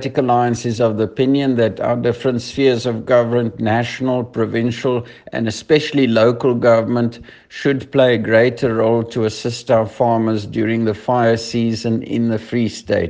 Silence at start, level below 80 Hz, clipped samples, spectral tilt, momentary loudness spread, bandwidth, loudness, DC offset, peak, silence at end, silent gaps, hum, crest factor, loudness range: 0 s; -52 dBFS; under 0.1%; -6.5 dB/octave; 7 LU; 9.4 kHz; -17 LUFS; under 0.1%; 0 dBFS; 0 s; none; none; 16 dB; 2 LU